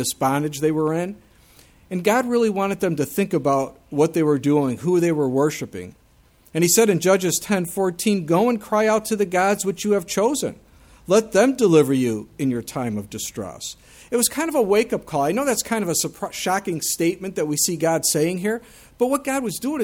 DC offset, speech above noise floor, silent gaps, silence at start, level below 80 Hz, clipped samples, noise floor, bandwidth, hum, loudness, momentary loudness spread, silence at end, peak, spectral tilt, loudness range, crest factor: under 0.1%; 34 dB; none; 0 s; -56 dBFS; under 0.1%; -55 dBFS; 18.5 kHz; none; -21 LUFS; 10 LU; 0 s; -4 dBFS; -4.5 dB/octave; 3 LU; 18 dB